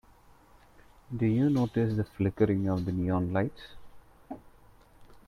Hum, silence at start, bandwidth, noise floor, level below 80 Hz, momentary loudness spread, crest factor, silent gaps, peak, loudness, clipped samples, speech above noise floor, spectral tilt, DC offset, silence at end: none; 1.1 s; 12.5 kHz; -58 dBFS; -56 dBFS; 20 LU; 18 dB; none; -12 dBFS; -29 LUFS; under 0.1%; 30 dB; -9.5 dB/octave; under 0.1%; 0.1 s